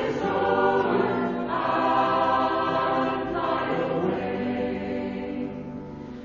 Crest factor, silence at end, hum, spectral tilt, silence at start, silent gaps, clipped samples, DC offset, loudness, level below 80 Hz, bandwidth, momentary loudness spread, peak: 14 dB; 0 s; none; -7 dB/octave; 0 s; none; under 0.1%; under 0.1%; -25 LUFS; -52 dBFS; 7.4 kHz; 10 LU; -10 dBFS